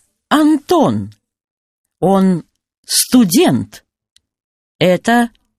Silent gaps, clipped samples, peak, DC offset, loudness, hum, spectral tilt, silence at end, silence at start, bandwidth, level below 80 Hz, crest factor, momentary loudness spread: 1.51-1.84 s, 2.78-2.83 s, 4.12-4.16 s, 4.44-4.79 s; under 0.1%; 0 dBFS; under 0.1%; -14 LUFS; none; -4.5 dB/octave; 0.3 s; 0.3 s; 15.5 kHz; -54 dBFS; 16 dB; 10 LU